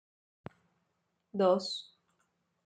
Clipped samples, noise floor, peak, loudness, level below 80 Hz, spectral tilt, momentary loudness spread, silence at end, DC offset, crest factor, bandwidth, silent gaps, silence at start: under 0.1%; -80 dBFS; -14 dBFS; -32 LUFS; -82 dBFS; -5.5 dB/octave; 24 LU; 0.85 s; under 0.1%; 22 dB; 9.2 kHz; none; 1.35 s